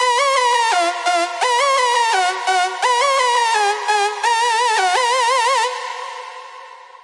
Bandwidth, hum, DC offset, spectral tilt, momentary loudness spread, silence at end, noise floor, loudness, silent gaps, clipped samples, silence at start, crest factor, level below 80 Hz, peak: 11.5 kHz; none; under 0.1%; 4 dB/octave; 12 LU; 0.1 s; -38 dBFS; -16 LUFS; none; under 0.1%; 0 s; 14 dB; under -90 dBFS; -4 dBFS